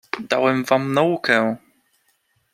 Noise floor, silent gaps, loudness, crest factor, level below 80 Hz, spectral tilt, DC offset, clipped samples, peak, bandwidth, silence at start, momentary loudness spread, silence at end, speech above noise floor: -66 dBFS; none; -19 LUFS; 20 dB; -66 dBFS; -5.5 dB/octave; under 0.1%; under 0.1%; -2 dBFS; 16 kHz; 0.15 s; 6 LU; 0.95 s; 47 dB